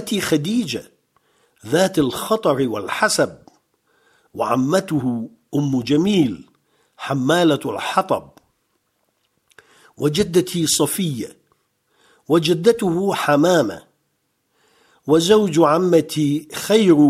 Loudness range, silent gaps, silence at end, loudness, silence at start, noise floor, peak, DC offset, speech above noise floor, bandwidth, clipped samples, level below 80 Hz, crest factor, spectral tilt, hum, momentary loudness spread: 4 LU; none; 0 s; -19 LUFS; 0 s; -69 dBFS; -2 dBFS; under 0.1%; 52 dB; 16 kHz; under 0.1%; -56 dBFS; 18 dB; -5 dB/octave; none; 10 LU